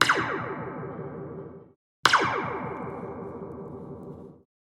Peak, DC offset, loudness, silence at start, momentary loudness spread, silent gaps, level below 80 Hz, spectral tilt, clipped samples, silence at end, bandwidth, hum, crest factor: 0 dBFS; under 0.1%; -28 LUFS; 0 s; 20 LU; 1.76-2.03 s; -62 dBFS; -3.5 dB/octave; under 0.1%; 0.3 s; 16 kHz; none; 30 dB